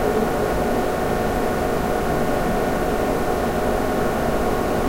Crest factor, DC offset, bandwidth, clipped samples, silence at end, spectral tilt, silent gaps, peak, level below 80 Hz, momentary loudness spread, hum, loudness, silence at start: 14 dB; under 0.1%; 16 kHz; under 0.1%; 0 s; -6 dB/octave; none; -8 dBFS; -30 dBFS; 1 LU; none; -22 LUFS; 0 s